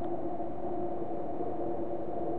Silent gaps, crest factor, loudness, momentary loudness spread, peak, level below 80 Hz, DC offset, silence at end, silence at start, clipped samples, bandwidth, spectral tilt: none; 12 dB; -37 LUFS; 2 LU; -22 dBFS; -58 dBFS; 2%; 0 s; 0 s; under 0.1%; 4.3 kHz; -10.5 dB/octave